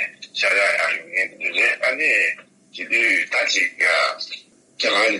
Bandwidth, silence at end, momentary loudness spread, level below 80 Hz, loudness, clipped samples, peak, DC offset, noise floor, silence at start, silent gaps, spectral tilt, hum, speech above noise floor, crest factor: 11.5 kHz; 0 s; 12 LU; -80 dBFS; -18 LUFS; under 0.1%; -6 dBFS; under 0.1%; -40 dBFS; 0 s; none; 0 dB/octave; none; 21 dB; 14 dB